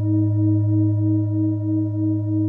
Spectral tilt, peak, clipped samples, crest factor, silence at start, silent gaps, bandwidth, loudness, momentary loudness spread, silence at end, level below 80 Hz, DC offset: -14.5 dB/octave; -10 dBFS; under 0.1%; 8 dB; 0 s; none; 1.4 kHz; -20 LUFS; 3 LU; 0 s; -62 dBFS; under 0.1%